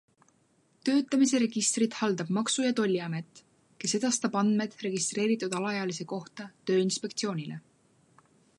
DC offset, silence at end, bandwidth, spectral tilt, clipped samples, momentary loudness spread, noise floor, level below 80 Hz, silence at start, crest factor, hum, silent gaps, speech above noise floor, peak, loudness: under 0.1%; 1 s; 11.5 kHz; -4 dB/octave; under 0.1%; 12 LU; -68 dBFS; -80 dBFS; 0.85 s; 16 dB; none; none; 39 dB; -14 dBFS; -29 LUFS